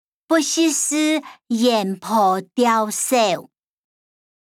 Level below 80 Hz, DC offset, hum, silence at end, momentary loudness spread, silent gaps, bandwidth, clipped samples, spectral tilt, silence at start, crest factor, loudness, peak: -74 dBFS; under 0.1%; none; 1.1 s; 4 LU; none; 18.5 kHz; under 0.1%; -3 dB/octave; 0.3 s; 16 dB; -19 LUFS; -4 dBFS